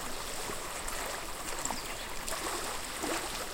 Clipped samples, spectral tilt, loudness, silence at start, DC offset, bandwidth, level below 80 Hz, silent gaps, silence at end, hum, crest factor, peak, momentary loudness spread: under 0.1%; -1.5 dB/octave; -36 LUFS; 0 s; under 0.1%; 17 kHz; -46 dBFS; none; 0 s; none; 20 dB; -18 dBFS; 3 LU